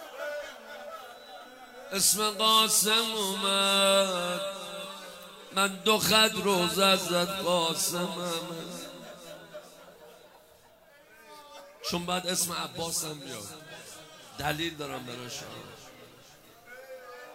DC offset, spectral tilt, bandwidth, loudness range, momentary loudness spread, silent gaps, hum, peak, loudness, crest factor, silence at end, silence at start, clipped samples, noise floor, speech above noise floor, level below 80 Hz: under 0.1%; -2 dB/octave; 16 kHz; 14 LU; 24 LU; none; none; -8 dBFS; -26 LUFS; 22 dB; 0 s; 0 s; under 0.1%; -58 dBFS; 30 dB; -66 dBFS